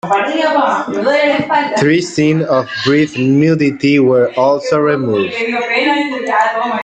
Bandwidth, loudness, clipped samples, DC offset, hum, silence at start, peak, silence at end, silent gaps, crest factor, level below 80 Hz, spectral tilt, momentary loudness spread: 9.2 kHz; -13 LUFS; under 0.1%; under 0.1%; none; 0.05 s; 0 dBFS; 0 s; none; 12 dB; -54 dBFS; -6 dB/octave; 4 LU